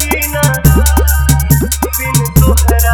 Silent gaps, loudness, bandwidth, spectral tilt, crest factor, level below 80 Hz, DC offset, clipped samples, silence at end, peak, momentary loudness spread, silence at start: none; -11 LUFS; over 20 kHz; -5 dB/octave; 10 dB; -14 dBFS; under 0.1%; 0.7%; 0 s; 0 dBFS; 4 LU; 0 s